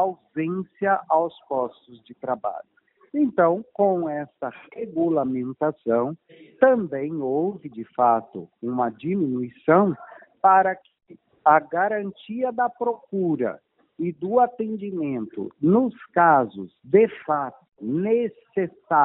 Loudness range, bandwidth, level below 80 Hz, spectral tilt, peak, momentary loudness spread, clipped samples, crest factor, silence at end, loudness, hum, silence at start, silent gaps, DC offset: 4 LU; 4 kHz; -68 dBFS; -7 dB/octave; -2 dBFS; 14 LU; under 0.1%; 20 dB; 0 s; -23 LUFS; none; 0 s; none; under 0.1%